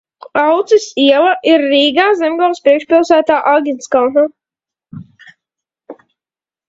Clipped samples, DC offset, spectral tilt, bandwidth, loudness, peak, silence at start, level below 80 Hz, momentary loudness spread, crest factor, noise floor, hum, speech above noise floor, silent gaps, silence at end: under 0.1%; under 0.1%; -3.5 dB/octave; 7.8 kHz; -12 LUFS; 0 dBFS; 0.35 s; -60 dBFS; 5 LU; 14 dB; under -90 dBFS; none; over 79 dB; none; 0.75 s